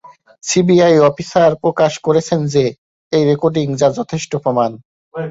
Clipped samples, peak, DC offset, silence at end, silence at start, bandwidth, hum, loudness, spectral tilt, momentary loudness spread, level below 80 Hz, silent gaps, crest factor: under 0.1%; -2 dBFS; under 0.1%; 0 s; 0.45 s; 8 kHz; none; -15 LUFS; -5.5 dB/octave; 10 LU; -54 dBFS; 2.78-3.11 s, 4.85-5.12 s; 14 dB